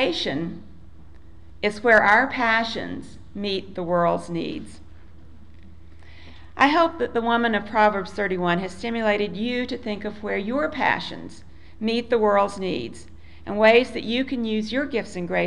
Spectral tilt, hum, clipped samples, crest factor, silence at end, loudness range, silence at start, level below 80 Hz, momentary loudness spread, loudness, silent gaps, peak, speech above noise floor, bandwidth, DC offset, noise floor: -5.5 dB/octave; none; under 0.1%; 18 dB; 0 s; 5 LU; 0 s; -50 dBFS; 16 LU; -22 LUFS; none; -4 dBFS; 25 dB; 11 kHz; 0.9%; -47 dBFS